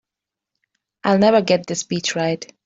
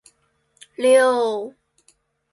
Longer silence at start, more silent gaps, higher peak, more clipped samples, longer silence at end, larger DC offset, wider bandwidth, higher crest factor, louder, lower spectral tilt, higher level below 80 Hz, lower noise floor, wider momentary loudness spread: first, 1.05 s vs 0.8 s; neither; about the same, -2 dBFS vs -4 dBFS; neither; second, 0.2 s vs 0.85 s; neither; second, 8 kHz vs 11.5 kHz; about the same, 18 dB vs 18 dB; about the same, -19 LUFS vs -18 LUFS; first, -4.5 dB/octave vs -2.5 dB/octave; first, -62 dBFS vs -72 dBFS; first, -86 dBFS vs -65 dBFS; second, 9 LU vs 22 LU